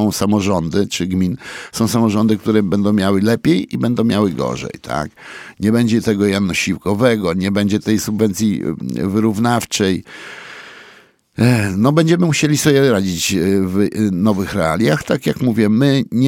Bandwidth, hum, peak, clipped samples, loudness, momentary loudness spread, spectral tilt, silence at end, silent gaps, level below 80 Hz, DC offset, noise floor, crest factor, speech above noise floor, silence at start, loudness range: 17 kHz; none; 0 dBFS; under 0.1%; -16 LUFS; 10 LU; -5.5 dB/octave; 0 s; none; -46 dBFS; under 0.1%; -47 dBFS; 16 dB; 31 dB; 0 s; 3 LU